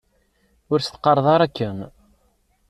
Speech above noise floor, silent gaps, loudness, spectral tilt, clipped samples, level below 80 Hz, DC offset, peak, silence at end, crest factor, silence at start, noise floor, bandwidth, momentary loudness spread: 45 dB; none; -20 LUFS; -6.5 dB/octave; under 0.1%; -56 dBFS; under 0.1%; -4 dBFS; 0.8 s; 20 dB; 0.7 s; -64 dBFS; 13 kHz; 16 LU